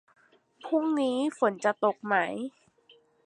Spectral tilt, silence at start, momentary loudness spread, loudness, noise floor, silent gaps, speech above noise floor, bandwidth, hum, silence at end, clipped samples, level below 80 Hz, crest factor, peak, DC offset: -5 dB/octave; 0.65 s; 11 LU; -28 LUFS; -62 dBFS; none; 34 dB; 11 kHz; none; 0.75 s; under 0.1%; -82 dBFS; 20 dB; -10 dBFS; under 0.1%